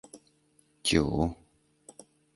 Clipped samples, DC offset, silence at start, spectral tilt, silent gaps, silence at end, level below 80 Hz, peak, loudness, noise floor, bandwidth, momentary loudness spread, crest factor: under 0.1%; under 0.1%; 0.15 s; -4.5 dB/octave; none; 1 s; -46 dBFS; -8 dBFS; -29 LUFS; -67 dBFS; 12 kHz; 26 LU; 24 dB